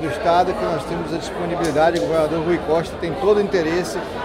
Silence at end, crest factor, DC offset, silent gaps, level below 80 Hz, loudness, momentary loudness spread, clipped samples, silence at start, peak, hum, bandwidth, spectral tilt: 0 s; 16 dB; under 0.1%; none; -42 dBFS; -20 LUFS; 7 LU; under 0.1%; 0 s; -4 dBFS; none; 16 kHz; -5.5 dB/octave